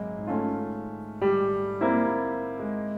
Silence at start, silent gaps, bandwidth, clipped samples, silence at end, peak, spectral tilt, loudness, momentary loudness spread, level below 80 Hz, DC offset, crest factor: 0 s; none; 4.8 kHz; under 0.1%; 0 s; -12 dBFS; -9 dB/octave; -28 LUFS; 9 LU; -58 dBFS; under 0.1%; 14 dB